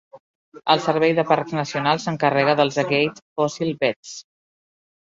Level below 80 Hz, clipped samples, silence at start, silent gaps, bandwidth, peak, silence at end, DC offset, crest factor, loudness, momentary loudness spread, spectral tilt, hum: -64 dBFS; under 0.1%; 0.15 s; 0.20-0.52 s, 3.22-3.36 s, 3.96-4.03 s; 7.8 kHz; -2 dBFS; 0.9 s; under 0.1%; 20 dB; -21 LUFS; 8 LU; -5 dB/octave; none